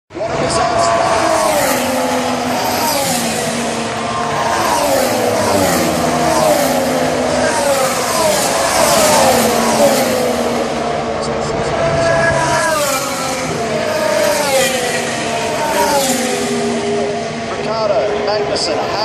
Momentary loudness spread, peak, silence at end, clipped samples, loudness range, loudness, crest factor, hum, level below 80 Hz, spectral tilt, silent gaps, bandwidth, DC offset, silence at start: 6 LU; 0 dBFS; 0 s; under 0.1%; 3 LU; -14 LUFS; 14 dB; none; -42 dBFS; -3 dB/octave; none; 15 kHz; under 0.1%; 0.1 s